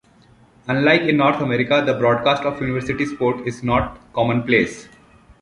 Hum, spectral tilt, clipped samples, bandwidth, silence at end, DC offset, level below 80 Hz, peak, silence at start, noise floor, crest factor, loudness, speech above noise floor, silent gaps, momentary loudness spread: none; -6.5 dB/octave; under 0.1%; 11.5 kHz; 0.6 s; under 0.1%; -44 dBFS; -2 dBFS; 0.65 s; -52 dBFS; 18 dB; -19 LUFS; 33 dB; none; 9 LU